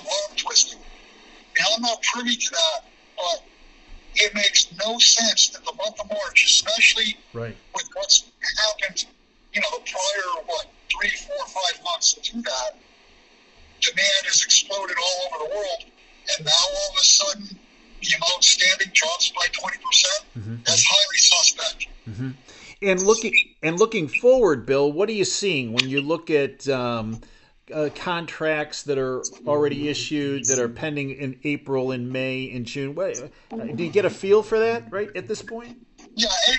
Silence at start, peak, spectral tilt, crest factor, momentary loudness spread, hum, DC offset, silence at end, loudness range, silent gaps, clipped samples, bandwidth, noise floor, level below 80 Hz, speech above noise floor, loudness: 0 s; 0 dBFS; -1 dB/octave; 22 dB; 16 LU; none; under 0.1%; 0 s; 8 LU; none; under 0.1%; 8.4 kHz; -54 dBFS; -52 dBFS; 32 dB; -20 LUFS